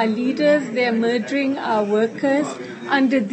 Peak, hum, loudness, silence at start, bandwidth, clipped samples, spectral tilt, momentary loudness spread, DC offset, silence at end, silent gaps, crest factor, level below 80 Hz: -6 dBFS; none; -20 LUFS; 0 s; 8.6 kHz; under 0.1%; -5.5 dB/octave; 4 LU; under 0.1%; 0 s; none; 14 dB; -72 dBFS